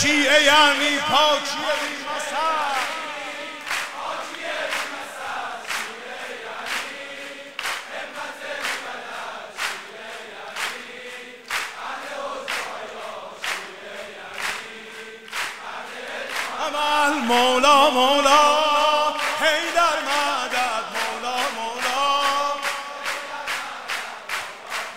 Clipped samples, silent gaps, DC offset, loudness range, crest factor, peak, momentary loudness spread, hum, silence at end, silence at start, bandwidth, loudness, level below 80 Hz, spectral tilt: under 0.1%; none; 0.2%; 13 LU; 20 dB; -2 dBFS; 18 LU; none; 0 s; 0 s; 16 kHz; -22 LUFS; -60 dBFS; -1 dB/octave